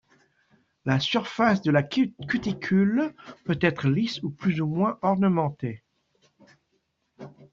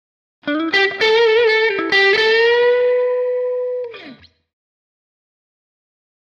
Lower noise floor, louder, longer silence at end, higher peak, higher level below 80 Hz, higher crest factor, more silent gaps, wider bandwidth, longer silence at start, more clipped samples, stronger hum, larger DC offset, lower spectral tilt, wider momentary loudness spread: first, -74 dBFS vs -41 dBFS; second, -25 LUFS vs -15 LUFS; second, 0.1 s vs 2.1 s; about the same, -6 dBFS vs -6 dBFS; about the same, -60 dBFS vs -64 dBFS; first, 20 dB vs 12 dB; neither; about the same, 7.2 kHz vs 7.2 kHz; first, 0.85 s vs 0.45 s; neither; second, none vs 50 Hz at -70 dBFS; neither; first, -7 dB/octave vs -3 dB/octave; about the same, 11 LU vs 11 LU